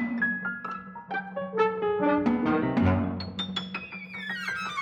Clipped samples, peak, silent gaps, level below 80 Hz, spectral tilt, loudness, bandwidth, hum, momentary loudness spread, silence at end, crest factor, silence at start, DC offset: under 0.1%; -12 dBFS; none; -56 dBFS; -6.5 dB/octave; -28 LUFS; 9.6 kHz; none; 11 LU; 0 s; 16 dB; 0 s; under 0.1%